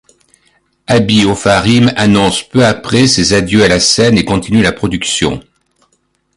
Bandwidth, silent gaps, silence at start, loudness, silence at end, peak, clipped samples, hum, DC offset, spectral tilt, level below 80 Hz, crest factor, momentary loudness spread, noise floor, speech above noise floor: 11.5 kHz; none; 0.9 s; -10 LUFS; 0.95 s; 0 dBFS; under 0.1%; none; under 0.1%; -4.5 dB/octave; -34 dBFS; 12 dB; 6 LU; -60 dBFS; 50 dB